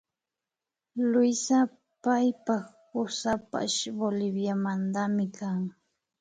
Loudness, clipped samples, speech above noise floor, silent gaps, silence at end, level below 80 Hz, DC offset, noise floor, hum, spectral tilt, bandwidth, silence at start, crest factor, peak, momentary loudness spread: -29 LUFS; under 0.1%; 62 dB; none; 0.5 s; -68 dBFS; under 0.1%; -90 dBFS; none; -4.5 dB/octave; 9.4 kHz; 0.95 s; 16 dB; -14 dBFS; 9 LU